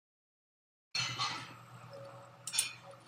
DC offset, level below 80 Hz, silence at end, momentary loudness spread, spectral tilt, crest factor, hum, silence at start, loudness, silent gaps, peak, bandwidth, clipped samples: under 0.1%; -82 dBFS; 0 s; 18 LU; -0.5 dB/octave; 28 dB; none; 0.95 s; -37 LUFS; none; -14 dBFS; 15 kHz; under 0.1%